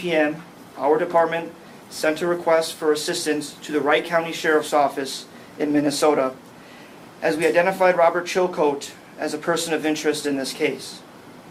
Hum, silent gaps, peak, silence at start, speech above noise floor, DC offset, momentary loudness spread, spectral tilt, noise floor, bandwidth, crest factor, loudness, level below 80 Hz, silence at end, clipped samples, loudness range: none; none; -4 dBFS; 0 s; 22 dB; under 0.1%; 14 LU; -4 dB/octave; -43 dBFS; 16 kHz; 18 dB; -22 LUFS; -68 dBFS; 0 s; under 0.1%; 2 LU